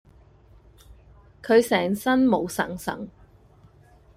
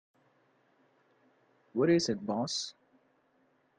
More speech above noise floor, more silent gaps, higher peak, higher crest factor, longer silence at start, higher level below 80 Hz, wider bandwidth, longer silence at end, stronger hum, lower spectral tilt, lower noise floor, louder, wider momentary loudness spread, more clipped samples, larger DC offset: second, 32 dB vs 41 dB; neither; first, -6 dBFS vs -16 dBFS; about the same, 20 dB vs 20 dB; second, 1.45 s vs 1.75 s; first, -54 dBFS vs -76 dBFS; first, 15.5 kHz vs 9.6 kHz; about the same, 1.1 s vs 1.1 s; neither; about the same, -5 dB/octave vs -4.5 dB/octave; second, -54 dBFS vs -71 dBFS; first, -23 LUFS vs -31 LUFS; first, 18 LU vs 12 LU; neither; neither